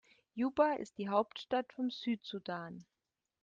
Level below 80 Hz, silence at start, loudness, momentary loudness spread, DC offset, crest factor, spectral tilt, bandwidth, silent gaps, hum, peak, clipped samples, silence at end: -78 dBFS; 0.35 s; -37 LUFS; 14 LU; under 0.1%; 22 dB; -6 dB/octave; 7.6 kHz; none; none; -16 dBFS; under 0.1%; 0.6 s